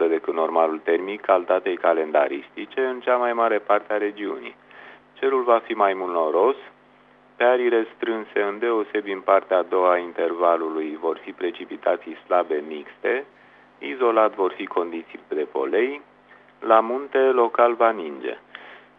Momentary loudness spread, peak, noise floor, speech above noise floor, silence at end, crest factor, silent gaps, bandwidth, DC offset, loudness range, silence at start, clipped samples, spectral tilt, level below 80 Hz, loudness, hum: 12 LU; -2 dBFS; -54 dBFS; 32 dB; 0.2 s; 20 dB; none; 4.4 kHz; under 0.1%; 3 LU; 0 s; under 0.1%; -6.5 dB/octave; -76 dBFS; -22 LUFS; none